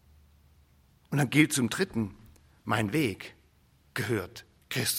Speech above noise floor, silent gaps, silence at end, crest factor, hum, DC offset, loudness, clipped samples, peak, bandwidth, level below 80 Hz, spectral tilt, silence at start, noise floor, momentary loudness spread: 35 dB; none; 0 s; 24 dB; none; under 0.1%; -29 LUFS; under 0.1%; -8 dBFS; 16.5 kHz; -62 dBFS; -4.5 dB/octave; 1.1 s; -63 dBFS; 20 LU